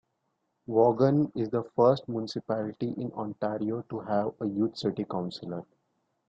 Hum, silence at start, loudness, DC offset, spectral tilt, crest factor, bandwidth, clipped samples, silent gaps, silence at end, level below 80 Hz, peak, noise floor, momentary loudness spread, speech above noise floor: none; 0.7 s; -29 LUFS; under 0.1%; -8.5 dB/octave; 20 dB; 8 kHz; under 0.1%; none; 0.65 s; -68 dBFS; -10 dBFS; -78 dBFS; 11 LU; 50 dB